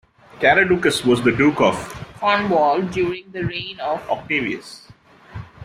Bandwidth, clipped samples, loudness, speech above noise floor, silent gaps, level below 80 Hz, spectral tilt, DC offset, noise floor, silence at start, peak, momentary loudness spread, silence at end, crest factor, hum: 15 kHz; under 0.1%; -19 LUFS; 22 dB; none; -50 dBFS; -5 dB/octave; under 0.1%; -41 dBFS; 0.35 s; -2 dBFS; 16 LU; 0 s; 18 dB; none